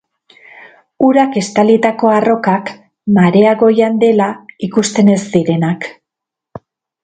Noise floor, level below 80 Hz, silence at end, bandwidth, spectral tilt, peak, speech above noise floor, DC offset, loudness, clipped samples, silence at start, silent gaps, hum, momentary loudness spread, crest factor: -82 dBFS; -56 dBFS; 1.1 s; 9.2 kHz; -6.5 dB/octave; 0 dBFS; 71 dB; under 0.1%; -12 LUFS; under 0.1%; 1 s; none; none; 9 LU; 12 dB